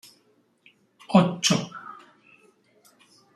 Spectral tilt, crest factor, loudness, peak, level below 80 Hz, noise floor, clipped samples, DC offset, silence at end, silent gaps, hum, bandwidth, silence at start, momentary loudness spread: -4.5 dB/octave; 22 dB; -22 LUFS; -6 dBFS; -68 dBFS; -65 dBFS; under 0.1%; under 0.1%; 1.4 s; none; none; 13.5 kHz; 1.1 s; 21 LU